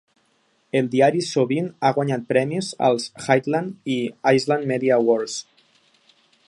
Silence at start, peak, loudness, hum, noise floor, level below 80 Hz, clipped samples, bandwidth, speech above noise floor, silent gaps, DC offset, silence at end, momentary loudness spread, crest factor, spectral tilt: 0.75 s; -2 dBFS; -21 LUFS; none; -65 dBFS; -68 dBFS; under 0.1%; 11.5 kHz; 44 dB; none; under 0.1%; 1.05 s; 7 LU; 20 dB; -5.5 dB/octave